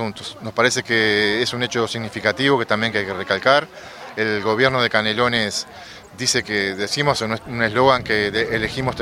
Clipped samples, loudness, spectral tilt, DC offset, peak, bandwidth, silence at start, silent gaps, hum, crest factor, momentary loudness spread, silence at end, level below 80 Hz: under 0.1%; -19 LUFS; -3.5 dB/octave; under 0.1%; 0 dBFS; 15.5 kHz; 0 s; none; none; 20 dB; 10 LU; 0 s; -50 dBFS